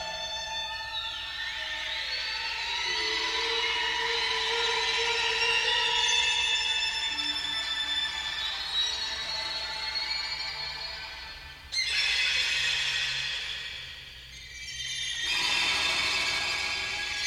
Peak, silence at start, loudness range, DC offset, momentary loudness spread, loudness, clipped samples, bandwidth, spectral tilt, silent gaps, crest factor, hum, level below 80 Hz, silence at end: -14 dBFS; 0 s; 5 LU; under 0.1%; 11 LU; -27 LUFS; under 0.1%; 16 kHz; 0.5 dB/octave; none; 16 dB; none; -54 dBFS; 0 s